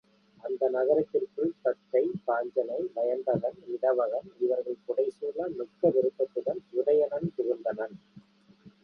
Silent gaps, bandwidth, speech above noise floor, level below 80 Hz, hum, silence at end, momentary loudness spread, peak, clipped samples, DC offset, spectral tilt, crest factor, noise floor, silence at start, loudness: none; 5.4 kHz; 28 dB; -74 dBFS; none; 0.15 s; 8 LU; -12 dBFS; under 0.1%; under 0.1%; -9.5 dB/octave; 18 dB; -57 dBFS; 0.45 s; -29 LUFS